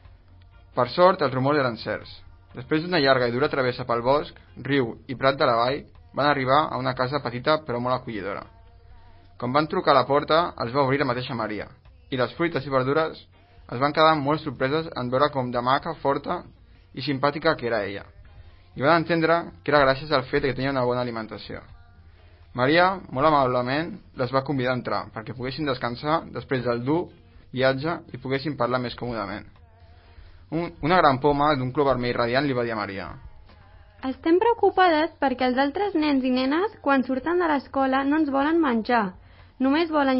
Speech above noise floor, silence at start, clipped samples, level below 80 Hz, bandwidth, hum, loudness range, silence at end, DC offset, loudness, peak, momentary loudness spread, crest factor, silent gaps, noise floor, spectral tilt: 27 dB; 0.75 s; under 0.1%; -50 dBFS; 5.8 kHz; none; 4 LU; 0 s; under 0.1%; -24 LUFS; -2 dBFS; 13 LU; 22 dB; none; -51 dBFS; -10.5 dB/octave